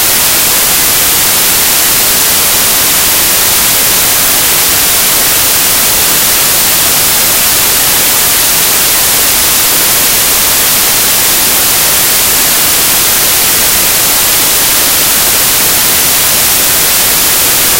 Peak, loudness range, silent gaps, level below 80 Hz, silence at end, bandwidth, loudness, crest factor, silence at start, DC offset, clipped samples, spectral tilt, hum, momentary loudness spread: 0 dBFS; 0 LU; none; -32 dBFS; 0 s; over 20 kHz; -5 LUFS; 8 dB; 0 s; under 0.1%; 0.9%; 0 dB/octave; none; 0 LU